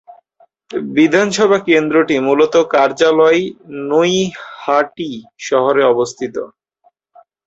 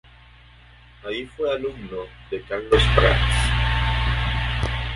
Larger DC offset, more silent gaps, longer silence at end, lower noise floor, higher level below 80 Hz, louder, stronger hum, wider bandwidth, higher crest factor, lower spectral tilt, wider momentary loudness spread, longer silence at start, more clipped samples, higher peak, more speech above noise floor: neither; neither; first, 1 s vs 0 s; first, -58 dBFS vs -48 dBFS; second, -60 dBFS vs -26 dBFS; first, -14 LUFS vs -22 LUFS; second, none vs 60 Hz at -30 dBFS; second, 8 kHz vs 11.5 kHz; second, 14 dB vs 22 dB; about the same, -4.5 dB/octave vs -5 dB/octave; about the same, 14 LU vs 16 LU; second, 0.7 s vs 1.05 s; neither; about the same, -2 dBFS vs -2 dBFS; first, 44 dB vs 27 dB